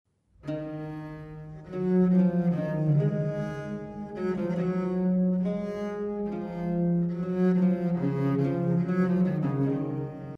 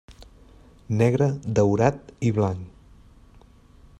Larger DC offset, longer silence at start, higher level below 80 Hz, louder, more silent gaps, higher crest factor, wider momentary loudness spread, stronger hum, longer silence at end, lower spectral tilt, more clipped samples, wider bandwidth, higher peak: neither; first, 0.45 s vs 0.1 s; second, -58 dBFS vs -50 dBFS; second, -28 LUFS vs -23 LUFS; neither; second, 14 dB vs 22 dB; first, 13 LU vs 9 LU; neither; second, 0 s vs 1.3 s; first, -10.5 dB/octave vs -8 dB/octave; neither; second, 6 kHz vs 9.8 kHz; second, -14 dBFS vs -2 dBFS